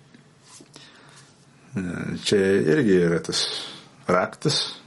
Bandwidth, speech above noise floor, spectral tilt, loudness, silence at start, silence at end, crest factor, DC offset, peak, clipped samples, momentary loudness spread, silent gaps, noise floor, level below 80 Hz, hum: 11.5 kHz; 30 dB; -4.5 dB/octave; -23 LUFS; 0.55 s; 0.1 s; 22 dB; under 0.1%; -4 dBFS; under 0.1%; 13 LU; none; -52 dBFS; -62 dBFS; none